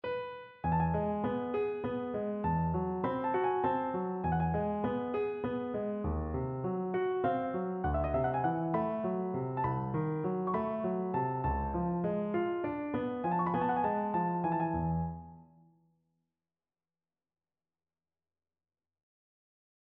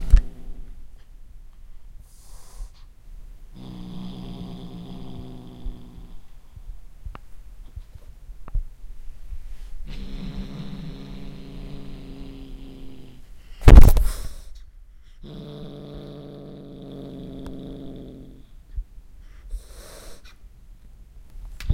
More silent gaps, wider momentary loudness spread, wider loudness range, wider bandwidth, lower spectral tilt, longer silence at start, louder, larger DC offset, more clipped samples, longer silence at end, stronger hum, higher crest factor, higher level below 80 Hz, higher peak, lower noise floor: neither; second, 5 LU vs 18 LU; second, 2 LU vs 22 LU; second, 4.3 kHz vs 16 kHz; about the same, -8 dB/octave vs -7 dB/octave; about the same, 0.05 s vs 0 s; second, -34 LUFS vs -25 LUFS; neither; second, under 0.1% vs 0.3%; first, 4.4 s vs 0 s; neither; second, 14 dB vs 22 dB; second, -50 dBFS vs -24 dBFS; second, -20 dBFS vs 0 dBFS; first, under -90 dBFS vs -45 dBFS